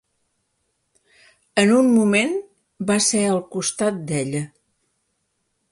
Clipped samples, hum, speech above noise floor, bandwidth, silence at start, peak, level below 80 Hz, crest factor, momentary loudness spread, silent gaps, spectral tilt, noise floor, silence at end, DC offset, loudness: under 0.1%; none; 53 dB; 11.5 kHz; 1.55 s; -2 dBFS; -64 dBFS; 20 dB; 13 LU; none; -4 dB/octave; -72 dBFS; 1.25 s; under 0.1%; -20 LUFS